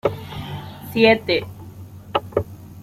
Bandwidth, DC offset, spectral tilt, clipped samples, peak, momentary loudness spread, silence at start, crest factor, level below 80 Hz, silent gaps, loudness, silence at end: 16 kHz; under 0.1%; -6 dB/octave; under 0.1%; -2 dBFS; 23 LU; 0.05 s; 20 dB; -50 dBFS; none; -21 LUFS; 0 s